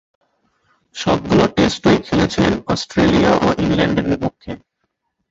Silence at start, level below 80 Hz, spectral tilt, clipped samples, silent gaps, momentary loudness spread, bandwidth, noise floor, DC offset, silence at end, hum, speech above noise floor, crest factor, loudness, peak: 0.95 s; -38 dBFS; -6 dB/octave; under 0.1%; none; 12 LU; 8 kHz; -72 dBFS; under 0.1%; 0.75 s; none; 56 dB; 16 dB; -16 LUFS; 0 dBFS